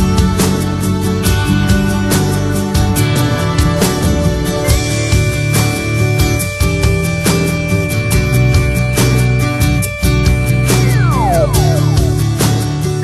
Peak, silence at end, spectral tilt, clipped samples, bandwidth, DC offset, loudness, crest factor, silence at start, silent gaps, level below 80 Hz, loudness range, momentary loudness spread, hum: 0 dBFS; 0 s; -5.5 dB/octave; under 0.1%; 13.5 kHz; under 0.1%; -13 LUFS; 12 dB; 0 s; none; -20 dBFS; 1 LU; 3 LU; none